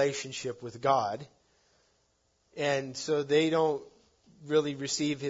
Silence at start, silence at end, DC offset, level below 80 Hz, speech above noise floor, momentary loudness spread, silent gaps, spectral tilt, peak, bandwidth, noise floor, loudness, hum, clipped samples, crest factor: 0 s; 0 s; under 0.1%; -74 dBFS; 43 dB; 11 LU; none; -4 dB/octave; -12 dBFS; 7.8 kHz; -72 dBFS; -30 LUFS; none; under 0.1%; 20 dB